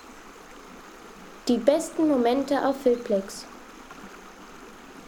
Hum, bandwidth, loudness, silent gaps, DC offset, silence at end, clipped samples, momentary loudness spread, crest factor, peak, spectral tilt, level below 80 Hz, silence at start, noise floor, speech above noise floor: none; 20 kHz; -24 LUFS; none; under 0.1%; 0 s; under 0.1%; 23 LU; 22 dB; -6 dBFS; -4.5 dB/octave; -58 dBFS; 0.05 s; -46 dBFS; 22 dB